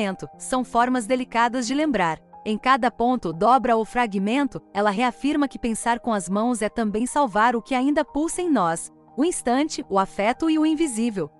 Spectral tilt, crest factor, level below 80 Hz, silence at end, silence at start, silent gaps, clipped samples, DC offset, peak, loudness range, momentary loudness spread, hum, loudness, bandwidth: -4.5 dB/octave; 16 dB; -52 dBFS; 0.1 s; 0 s; none; under 0.1%; under 0.1%; -6 dBFS; 2 LU; 6 LU; none; -22 LUFS; 12 kHz